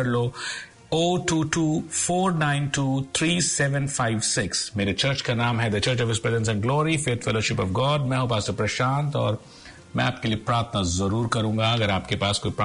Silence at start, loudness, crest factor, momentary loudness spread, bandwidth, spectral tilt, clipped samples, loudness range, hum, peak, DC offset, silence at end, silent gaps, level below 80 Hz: 0 s; -24 LUFS; 14 dB; 4 LU; 11 kHz; -4.5 dB/octave; under 0.1%; 2 LU; none; -10 dBFS; under 0.1%; 0 s; none; -50 dBFS